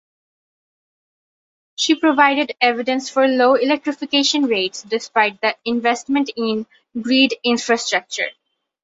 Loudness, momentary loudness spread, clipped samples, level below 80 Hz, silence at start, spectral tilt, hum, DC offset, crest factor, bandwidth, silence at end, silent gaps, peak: -18 LUFS; 9 LU; under 0.1%; -68 dBFS; 1.8 s; -2.5 dB/octave; none; under 0.1%; 18 dB; 8 kHz; 0.5 s; none; -2 dBFS